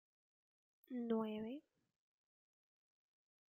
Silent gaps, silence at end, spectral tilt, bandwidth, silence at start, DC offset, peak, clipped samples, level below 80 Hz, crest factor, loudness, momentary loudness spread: none; 1.95 s; -8.5 dB/octave; 14.5 kHz; 0.9 s; under 0.1%; -28 dBFS; under 0.1%; under -90 dBFS; 22 dB; -45 LUFS; 10 LU